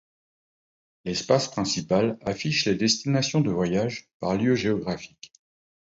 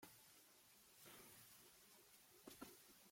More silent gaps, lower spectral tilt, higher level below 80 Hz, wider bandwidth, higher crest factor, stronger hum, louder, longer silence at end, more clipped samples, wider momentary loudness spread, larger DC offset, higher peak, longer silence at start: first, 4.14-4.20 s vs none; first, -4.5 dB/octave vs -2 dB/octave; first, -56 dBFS vs -90 dBFS; second, 8 kHz vs 16.5 kHz; about the same, 20 dB vs 22 dB; neither; first, -25 LUFS vs -64 LUFS; first, 0.6 s vs 0 s; neither; about the same, 9 LU vs 7 LU; neither; first, -8 dBFS vs -44 dBFS; first, 1.05 s vs 0 s